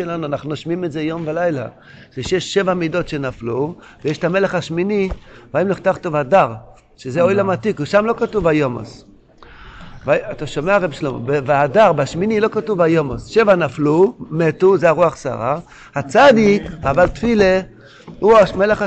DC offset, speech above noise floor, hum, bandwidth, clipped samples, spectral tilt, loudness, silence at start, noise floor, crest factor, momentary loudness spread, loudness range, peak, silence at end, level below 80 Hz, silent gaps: under 0.1%; 27 dB; none; 8.8 kHz; under 0.1%; -6.5 dB/octave; -17 LUFS; 0 s; -43 dBFS; 14 dB; 12 LU; 6 LU; -2 dBFS; 0 s; -42 dBFS; none